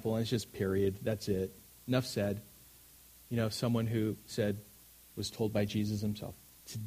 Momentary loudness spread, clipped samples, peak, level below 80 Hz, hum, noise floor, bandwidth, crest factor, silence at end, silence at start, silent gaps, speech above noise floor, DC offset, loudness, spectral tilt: 23 LU; under 0.1%; -16 dBFS; -62 dBFS; none; -58 dBFS; 15.5 kHz; 20 dB; 0 s; 0 s; none; 25 dB; under 0.1%; -35 LUFS; -6 dB/octave